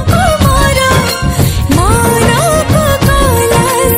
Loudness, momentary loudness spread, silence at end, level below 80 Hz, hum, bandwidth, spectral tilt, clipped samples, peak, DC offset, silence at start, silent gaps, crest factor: -9 LUFS; 3 LU; 0 s; -18 dBFS; none; 16.5 kHz; -4.5 dB/octave; 0.4%; 0 dBFS; under 0.1%; 0 s; none; 8 dB